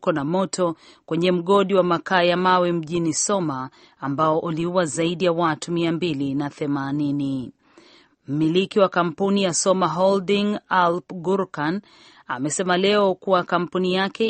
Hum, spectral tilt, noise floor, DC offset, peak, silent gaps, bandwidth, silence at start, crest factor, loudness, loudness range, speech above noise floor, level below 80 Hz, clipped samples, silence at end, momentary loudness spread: none; -4.5 dB/octave; -53 dBFS; under 0.1%; -4 dBFS; none; 8.8 kHz; 0 s; 18 dB; -21 LUFS; 3 LU; 32 dB; -62 dBFS; under 0.1%; 0 s; 9 LU